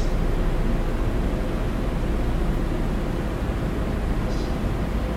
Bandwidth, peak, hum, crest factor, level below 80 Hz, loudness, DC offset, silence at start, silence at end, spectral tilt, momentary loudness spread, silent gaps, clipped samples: 14 kHz; -12 dBFS; none; 12 dB; -24 dBFS; -27 LUFS; under 0.1%; 0 s; 0 s; -7 dB/octave; 1 LU; none; under 0.1%